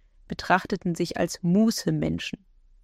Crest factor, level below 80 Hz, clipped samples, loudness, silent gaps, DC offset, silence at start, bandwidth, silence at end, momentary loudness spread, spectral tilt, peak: 20 dB; -52 dBFS; under 0.1%; -26 LUFS; none; under 0.1%; 0.3 s; 15.5 kHz; 0.5 s; 14 LU; -5.5 dB/octave; -6 dBFS